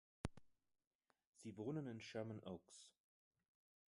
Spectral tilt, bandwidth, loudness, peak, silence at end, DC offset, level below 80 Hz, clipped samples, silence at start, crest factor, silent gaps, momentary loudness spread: -6 dB/octave; 11.5 kHz; -52 LUFS; -28 dBFS; 0.95 s; under 0.1%; -70 dBFS; under 0.1%; 0.25 s; 26 dB; 0.87-0.99 s, 1.26-1.33 s; 15 LU